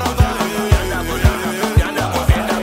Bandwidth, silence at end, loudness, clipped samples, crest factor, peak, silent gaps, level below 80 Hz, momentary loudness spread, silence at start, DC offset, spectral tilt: 16.5 kHz; 0 s; -17 LUFS; under 0.1%; 16 dB; 0 dBFS; none; -22 dBFS; 3 LU; 0 s; under 0.1%; -5.5 dB/octave